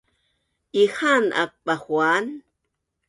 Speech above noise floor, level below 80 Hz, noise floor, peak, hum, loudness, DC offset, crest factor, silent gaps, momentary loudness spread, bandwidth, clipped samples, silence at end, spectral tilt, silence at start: 57 dB; -70 dBFS; -78 dBFS; -6 dBFS; none; -21 LUFS; under 0.1%; 18 dB; none; 10 LU; 11.5 kHz; under 0.1%; 0.7 s; -4 dB/octave; 0.75 s